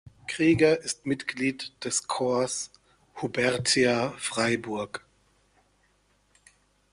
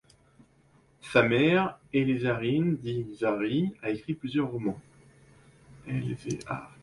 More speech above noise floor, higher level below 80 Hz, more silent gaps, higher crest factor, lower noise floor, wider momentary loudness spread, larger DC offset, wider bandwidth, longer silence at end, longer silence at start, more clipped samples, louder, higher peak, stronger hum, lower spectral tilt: first, 41 dB vs 34 dB; about the same, -62 dBFS vs -60 dBFS; neither; about the same, 20 dB vs 22 dB; first, -67 dBFS vs -62 dBFS; about the same, 13 LU vs 12 LU; neither; about the same, 11.5 kHz vs 11.5 kHz; first, 1.95 s vs 0.15 s; second, 0.3 s vs 1.05 s; neither; about the same, -27 LUFS vs -28 LUFS; about the same, -8 dBFS vs -8 dBFS; first, 50 Hz at -65 dBFS vs none; second, -3.5 dB/octave vs -7 dB/octave